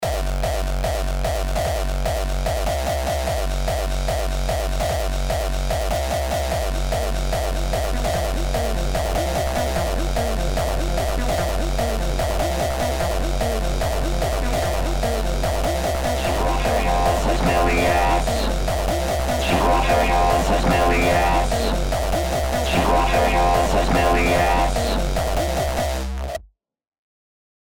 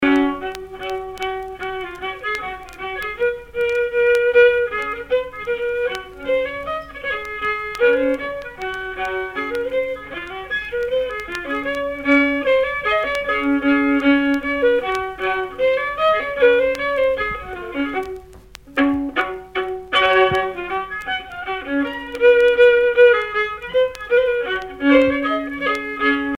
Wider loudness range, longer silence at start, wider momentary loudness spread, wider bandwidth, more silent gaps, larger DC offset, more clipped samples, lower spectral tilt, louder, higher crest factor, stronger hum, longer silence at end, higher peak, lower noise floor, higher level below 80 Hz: about the same, 5 LU vs 7 LU; about the same, 0 s vs 0 s; second, 6 LU vs 13 LU; first, 19.5 kHz vs 12 kHz; first, 26.88-26.92 s vs none; first, 0.8% vs under 0.1%; neither; about the same, -5 dB/octave vs -5 dB/octave; about the same, -21 LUFS vs -19 LUFS; about the same, 14 dB vs 18 dB; neither; first, 0.6 s vs 0 s; second, -6 dBFS vs 0 dBFS; first, -50 dBFS vs -42 dBFS; first, -24 dBFS vs -46 dBFS